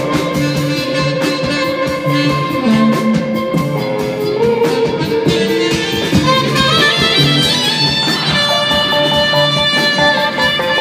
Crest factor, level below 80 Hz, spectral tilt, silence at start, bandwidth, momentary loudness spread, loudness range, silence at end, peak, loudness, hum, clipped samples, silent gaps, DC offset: 14 dB; -42 dBFS; -4.5 dB/octave; 0 s; 15.5 kHz; 6 LU; 4 LU; 0 s; 0 dBFS; -13 LUFS; none; under 0.1%; none; under 0.1%